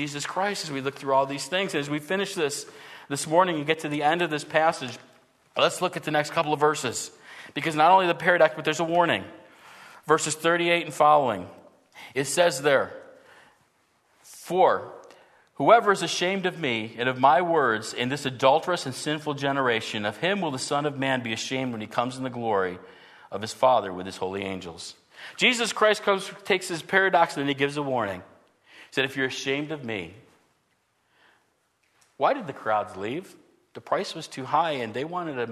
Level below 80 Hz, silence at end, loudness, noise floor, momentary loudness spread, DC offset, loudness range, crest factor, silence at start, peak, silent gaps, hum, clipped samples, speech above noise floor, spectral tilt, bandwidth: -72 dBFS; 0 s; -25 LUFS; -70 dBFS; 14 LU; under 0.1%; 8 LU; 22 dB; 0 s; -4 dBFS; none; none; under 0.1%; 45 dB; -3.5 dB/octave; 13.5 kHz